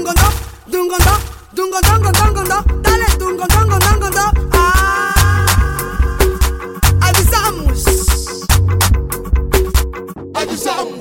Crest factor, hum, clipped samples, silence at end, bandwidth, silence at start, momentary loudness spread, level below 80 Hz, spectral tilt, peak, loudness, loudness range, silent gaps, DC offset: 12 dB; none; under 0.1%; 0 s; 17 kHz; 0 s; 8 LU; -18 dBFS; -4 dB/octave; 0 dBFS; -14 LUFS; 2 LU; none; under 0.1%